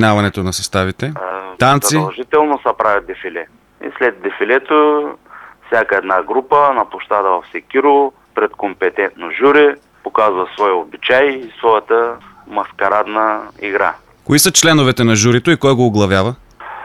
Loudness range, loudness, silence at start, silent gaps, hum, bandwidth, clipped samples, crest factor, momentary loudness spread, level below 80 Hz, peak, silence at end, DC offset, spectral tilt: 4 LU; -14 LUFS; 0 s; none; none; 15 kHz; under 0.1%; 14 dB; 12 LU; -50 dBFS; 0 dBFS; 0 s; under 0.1%; -4 dB/octave